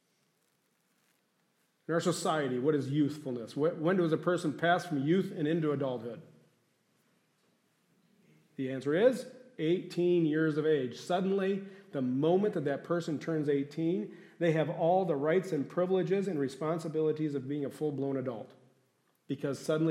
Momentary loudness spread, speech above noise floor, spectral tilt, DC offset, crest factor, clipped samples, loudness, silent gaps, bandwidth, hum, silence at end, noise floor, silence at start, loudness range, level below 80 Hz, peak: 10 LU; 44 dB; -6.5 dB/octave; under 0.1%; 20 dB; under 0.1%; -32 LUFS; none; 15.5 kHz; none; 0 s; -75 dBFS; 1.9 s; 5 LU; -84 dBFS; -14 dBFS